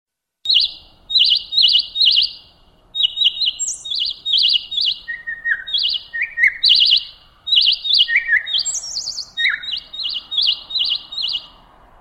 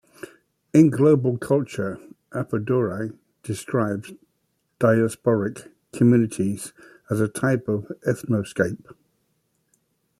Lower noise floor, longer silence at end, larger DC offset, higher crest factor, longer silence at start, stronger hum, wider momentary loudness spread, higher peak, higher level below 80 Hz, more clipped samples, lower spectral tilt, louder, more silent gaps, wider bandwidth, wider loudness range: second, -51 dBFS vs -72 dBFS; second, 0.55 s vs 1.3 s; neither; about the same, 16 dB vs 20 dB; second, 0.45 s vs 0.75 s; neither; second, 11 LU vs 21 LU; about the same, -2 dBFS vs -4 dBFS; first, -54 dBFS vs -62 dBFS; neither; second, 3.5 dB/octave vs -7.5 dB/octave; first, -15 LUFS vs -23 LUFS; neither; first, 15.5 kHz vs 14 kHz; about the same, 4 LU vs 5 LU